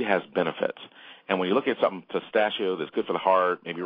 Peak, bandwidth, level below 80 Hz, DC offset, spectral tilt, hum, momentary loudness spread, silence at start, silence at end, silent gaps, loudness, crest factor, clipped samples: -6 dBFS; 5.2 kHz; -76 dBFS; under 0.1%; -8.5 dB/octave; none; 10 LU; 0 s; 0 s; none; -26 LUFS; 20 dB; under 0.1%